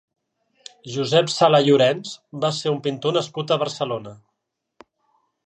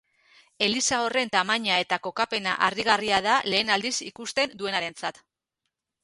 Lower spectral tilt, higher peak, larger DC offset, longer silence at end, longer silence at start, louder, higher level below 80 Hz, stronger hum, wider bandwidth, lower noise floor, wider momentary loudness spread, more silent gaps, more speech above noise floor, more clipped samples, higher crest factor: first, -5 dB/octave vs -1.5 dB/octave; first, -2 dBFS vs -6 dBFS; neither; first, 1.3 s vs 0.95 s; first, 0.85 s vs 0.6 s; first, -20 LUFS vs -24 LUFS; second, -72 dBFS vs -64 dBFS; neither; second, 10 kHz vs 11.5 kHz; second, -79 dBFS vs -83 dBFS; first, 15 LU vs 7 LU; neither; about the same, 59 dB vs 57 dB; neither; about the same, 20 dB vs 22 dB